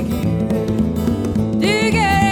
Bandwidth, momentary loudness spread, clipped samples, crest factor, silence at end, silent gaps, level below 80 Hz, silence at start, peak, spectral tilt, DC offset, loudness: 18 kHz; 5 LU; under 0.1%; 16 dB; 0 s; none; -32 dBFS; 0 s; -2 dBFS; -6 dB/octave; under 0.1%; -17 LUFS